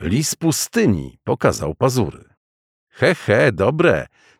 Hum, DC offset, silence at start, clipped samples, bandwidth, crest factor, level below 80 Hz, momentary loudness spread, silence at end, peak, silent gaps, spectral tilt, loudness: none; under 0.1%; 0 s; under 0.1%; 17.5 kHz; 18 dB; -44 dBFS; 7 LU; 0.35 s; -2 dBFS; 2.37-2.87 s; -5 dB/octave; -18 LUFS